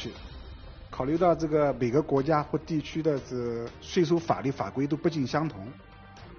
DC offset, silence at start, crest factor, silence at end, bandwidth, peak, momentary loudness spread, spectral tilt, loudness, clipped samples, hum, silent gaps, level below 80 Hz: under 0.1%; 0 s; 20 dB; 0 s; 6.8 kHz; -8 dBFS; 19 LU; -6.5 dB/octave; -28 LUFS; under 0.1%; none; none; -50 dBFS